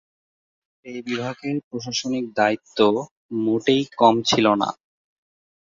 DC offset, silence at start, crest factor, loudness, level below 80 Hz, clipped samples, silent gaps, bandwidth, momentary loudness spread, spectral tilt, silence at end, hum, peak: under 0.1%; 0.85 s; 22 dB; -21 LUFS; -62 dBFS; under 0.1%; 1.64-1.71 s, 3.11-3.29 s; 7.6 kHz; 11 LU; -4.5 dB/octave; 0.85 s; none; -2 dBFS